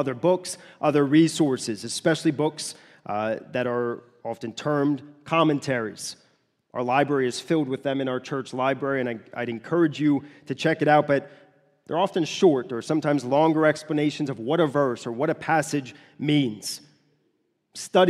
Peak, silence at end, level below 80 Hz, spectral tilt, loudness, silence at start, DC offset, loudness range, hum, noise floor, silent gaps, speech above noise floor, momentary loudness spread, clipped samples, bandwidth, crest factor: -4 dBFS; 0 s; -72 dBFS; -5.5 dB/octave; -24 LUFS; 0 s; under 0.1%; 4 LU; none; -71 dBFS; none; 47 dB; 13 LU; under 0.1%; 13.5 kHz; 20 dB